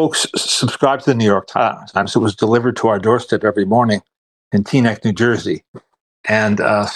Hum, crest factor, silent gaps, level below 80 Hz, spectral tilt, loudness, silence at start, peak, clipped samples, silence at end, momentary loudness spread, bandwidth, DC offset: none; 14 dB; 4.17-4.51 s, 5.68-5.74 s, 6.01-6.24 s; -56 dBFS; -5 dB/octave; -16 LUFS; 0 s; -2 dBFS; under 0.1%; 0 s; 6 LU; 12.5 kHz; under 0.1%